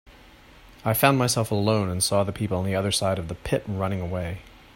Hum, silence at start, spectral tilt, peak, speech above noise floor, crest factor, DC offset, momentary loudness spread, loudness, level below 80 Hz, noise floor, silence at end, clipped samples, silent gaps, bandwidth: none; 0.05 s; -4.5 dB/octave; -4 dBFS; 26 dB; 20 dB; under 0.1%; 10 LU; -24 LUFS; -50 dBFS; -50 dBFS; 0.25 s; under 0.1%; none; 16.5 kHz